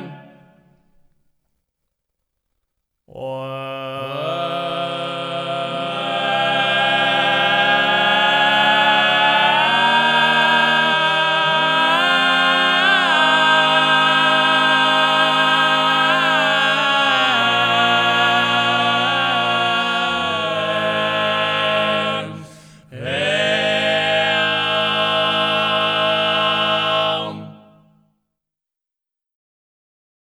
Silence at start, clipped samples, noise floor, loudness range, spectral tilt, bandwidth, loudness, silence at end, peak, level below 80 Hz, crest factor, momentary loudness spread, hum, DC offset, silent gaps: 0 s; under 0.1%; -86 dBFS; 11 LU; -3.5 dB/octave; 16 kHz; -15 LUFS; 2.75 s; -2 dBFS; -66 dBFS; 16 dB; 10 LU; none; under 0.1%; none